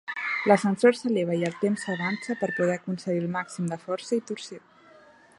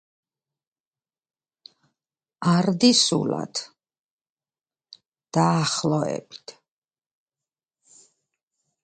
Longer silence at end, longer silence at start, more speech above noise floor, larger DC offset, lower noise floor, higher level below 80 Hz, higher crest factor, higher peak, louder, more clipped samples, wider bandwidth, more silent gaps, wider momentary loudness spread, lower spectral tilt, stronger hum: second, 0.8 s vs 2.3 s; second, 0.05 s vs 2.4 s; second, 28 dB vs over 68 dB; neither; second, -54 dBFS vs under -90 dBFS; second, -74 dBFS vs -68 dBFS; about the same, 22 dB vs 22 dB; about the same, -4 dBFS vs -4 dBFS; second, -26 LUFS vs -22 LUFS; neither; first, 11.5 kHz vs 9.4 kHz; second, none vs 3.99-4.18 s, 4.30-4.37 s, 5.08-5.12 s; second, 11 LU vs 17 LU; first, -6 dB/octave vs -4.5 dB/octave; neither